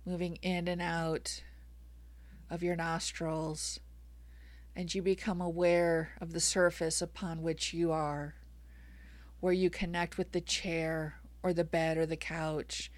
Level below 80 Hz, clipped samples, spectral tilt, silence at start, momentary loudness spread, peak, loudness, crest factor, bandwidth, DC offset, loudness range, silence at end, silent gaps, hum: -52 dBFS; under 0.1%; -4 dB/octave; 0 s; 9 LU; -16 dBFS; -34 LUFS; 18 dB; 15.5 kHz; under 0.1%; 6 LU; 0 s; none; none